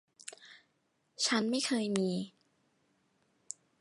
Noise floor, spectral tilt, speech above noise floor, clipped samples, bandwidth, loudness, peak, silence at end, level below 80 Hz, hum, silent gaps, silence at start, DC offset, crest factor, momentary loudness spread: -77 dBFS; -3.5 dB/octave; 45 dB; under 0.1%; 11.5 kHz; -32 LUFS; -16 dBFS; 1.5 s; -82 dBFS; none; none; 0.25 s; under 0.1%; 22 dB; 18 LU